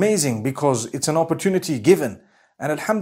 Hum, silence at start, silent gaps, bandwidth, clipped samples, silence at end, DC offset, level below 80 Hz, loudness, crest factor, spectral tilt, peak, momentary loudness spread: none; 0 s; none; 16 kHz; under 0.1%; 0 s; under 0.1%; -64 dBFS; -21 LUFS; 18 dB; -5 dB/octave; -2 dBFS; 8 LU